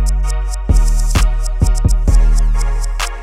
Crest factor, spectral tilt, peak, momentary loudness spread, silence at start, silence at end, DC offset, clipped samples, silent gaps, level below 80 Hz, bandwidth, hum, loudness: 10 dB; -5 dB/octave; -2 dBFS; 6 LU; 0 s; 0 s; under 0.1%; under 0.1%; none; -12 dBFS; 13 kHz; none; -17 LUFS